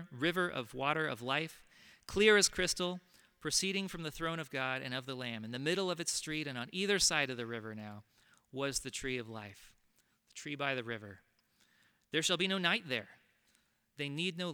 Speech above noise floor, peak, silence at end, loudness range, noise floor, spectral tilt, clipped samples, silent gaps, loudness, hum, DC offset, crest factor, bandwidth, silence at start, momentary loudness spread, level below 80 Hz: 39 dB; -14 dBFS; 0 s; 9 LU; -74 dBFS; -2.5 dB/octave; under 0.1%; none; -35 LUFS; none; under 0.1%; 24 dB; over 20 kHz; 0 s; 17 LU; -64 dBFS